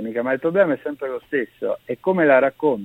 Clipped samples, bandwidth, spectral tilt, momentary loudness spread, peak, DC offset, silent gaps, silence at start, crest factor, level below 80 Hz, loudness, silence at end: under 0.1%; 16 kHz; -8.5 dB/octave; 11 LU; -2 dBFS; under 0.1%; none; 0 s; 18 dB; -64 dBFS; -20 LUFS; 0 s